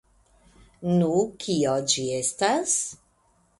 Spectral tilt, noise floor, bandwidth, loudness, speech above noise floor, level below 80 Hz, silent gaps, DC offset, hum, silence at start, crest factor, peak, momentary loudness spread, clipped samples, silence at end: -4 dB/octave; -65 dBFS; 11.5 kHz; -24 LUFS; 40 dB; -60 dBFS; none; under 0.1%; none; 0.8 s; 20 dB; -6 dBFS; 5 LU; under 0.1%; 0.65 s